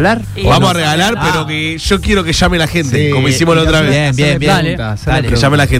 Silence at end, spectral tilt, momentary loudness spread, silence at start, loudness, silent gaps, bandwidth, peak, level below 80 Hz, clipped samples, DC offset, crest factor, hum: 0 s; -5 dB/octave; 5 LU; 0 s; -11 LUFS; none; 16 kHz; 0 dBFS; -24 dBFS; under 0.1%; under 0.1%; 12 dB; none